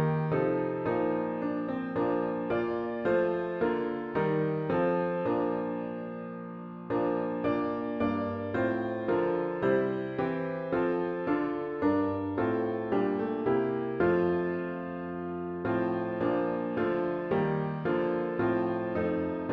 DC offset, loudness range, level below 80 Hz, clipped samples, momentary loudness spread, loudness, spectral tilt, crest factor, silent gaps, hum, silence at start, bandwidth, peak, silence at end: under 0.1%; 2 LU; -62 dBFS; under 0.1%; 6 LU; -30 LUFS; -10 dB/octave; 14 dB; none; none; 0 s; 5.2 kHz; -16 dBFS; 0 s